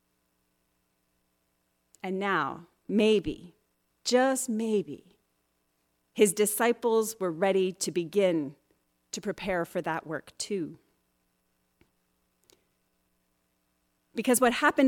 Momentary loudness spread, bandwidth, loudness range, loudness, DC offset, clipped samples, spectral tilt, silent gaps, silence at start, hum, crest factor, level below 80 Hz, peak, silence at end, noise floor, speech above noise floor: 16 LU; 18 kHz; 11 LU; -28 LUFS; under 0.1%; under 0.1%; -4 dB/octave; none; 2.05 s; none; 20 dB; -64 dBFS; -10 dBFS; 0 s; -75 dBFS; 48 dB